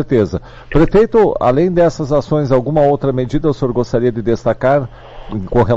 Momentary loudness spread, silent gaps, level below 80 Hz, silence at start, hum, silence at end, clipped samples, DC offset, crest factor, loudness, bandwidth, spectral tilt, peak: 7 LU; none; -30 dBFS; 0 s; none; 0 s; under 0.1%; under 0.1%; 10 dB; -14 LUFS; 7.8 kHz; -8.5 dB/octave; -4 dBFS